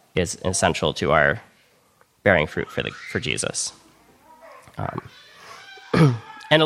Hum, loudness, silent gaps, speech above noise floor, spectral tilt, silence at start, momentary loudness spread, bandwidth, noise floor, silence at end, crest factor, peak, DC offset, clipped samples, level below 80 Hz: none; -22 LUFS; none; 37 dB; -4.5 dB/octave; 0.15 s; 18 LU; 14 kHz; -60 dBFS; 0 s; 22 dB; -2 dBFS; under 0.1%; under 0.1%; -48 dBFS